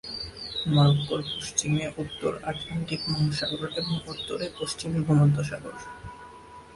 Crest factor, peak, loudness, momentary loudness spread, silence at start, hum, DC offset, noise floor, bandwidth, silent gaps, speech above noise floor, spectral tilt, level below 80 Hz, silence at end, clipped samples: 18 dB; -10 dBFS; -27 LUFS; 19 LU; 0.05 s; none; under 0.1%; -47 dBFS; 11.5 kHz; none; 20 dB; -5 dB/octave; -52 dBFS; 0 s; under 0.1%